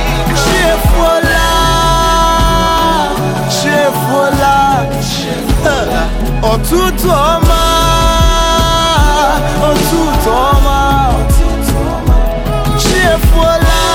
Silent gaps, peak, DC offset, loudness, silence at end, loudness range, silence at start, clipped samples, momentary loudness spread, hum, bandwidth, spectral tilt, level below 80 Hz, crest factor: none; 0 dBFS; under 0.1%; -11 LUFS; 0 s; 2 LU; 0 s; under 0.1%; 5 LU; none; 17.5 kHz; -4.5 dB/octave; -14 dBFS; 10 dB